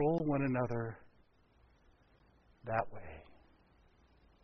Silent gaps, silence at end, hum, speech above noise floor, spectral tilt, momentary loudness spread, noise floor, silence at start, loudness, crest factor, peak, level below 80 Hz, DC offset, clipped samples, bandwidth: none; 1.1 s; none; 31 dB; -8.5 dB/octave; 21 LU; -68 dBFS; 0 s; -37 LUFS; 20 dB; -18 dBFS; -62 dBFS; under 0.1%; under 0.1%; 6 kHz